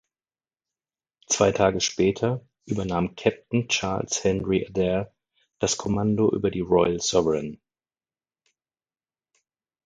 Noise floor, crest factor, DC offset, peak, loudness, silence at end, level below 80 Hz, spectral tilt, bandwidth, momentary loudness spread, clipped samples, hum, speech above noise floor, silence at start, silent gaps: under -90 dBFS; 22 dB; under 0.1%; -4 dBFS; -24 LUFS; 2.3 s; -50 dBFS; -4.5 dB/octave; 9.6 kHz; 7 LU; under 0.1%; none; over 66 dB; 1.3 s; none